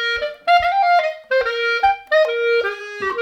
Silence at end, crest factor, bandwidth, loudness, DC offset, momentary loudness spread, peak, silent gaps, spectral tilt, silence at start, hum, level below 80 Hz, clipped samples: 0 s; 14 dB; 14 kHz; -18 LUFS; under 0.1%; 7 LU; -4 dBFS; none; -2.5 dB/octave; 0 s; none; -50 dBFS; under 0.1%